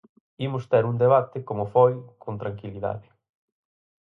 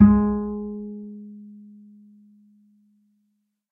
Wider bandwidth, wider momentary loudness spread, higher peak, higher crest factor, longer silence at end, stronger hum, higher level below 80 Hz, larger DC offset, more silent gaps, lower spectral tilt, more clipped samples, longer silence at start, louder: first, 4.1 kHz vs 2.4 kHz; second, 14 LU vs 26 LU; second, -6 dBFS vs -2 dBFS; about the same, 20 dB vs 22 dB; second, 1 s vs 2.2 s; neither; second, -60 dBFS vs -42 dBFS; neither; neither; second, -9.5 dB/octave vs -14 dB/octave; neither; first, 0.4 s vs 0 s; about the same, -24 LUFS vs -24 LUFS